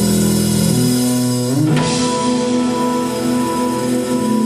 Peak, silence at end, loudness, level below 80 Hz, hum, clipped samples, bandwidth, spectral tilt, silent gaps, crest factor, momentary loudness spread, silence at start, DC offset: -4 dBFS; 0 s; -16 LUFS; -44 dBFS; none; under 0.1%; 14 kHz; -5 dB/octave; none; 12 dB; 3 LU; 0 s; under 0.1%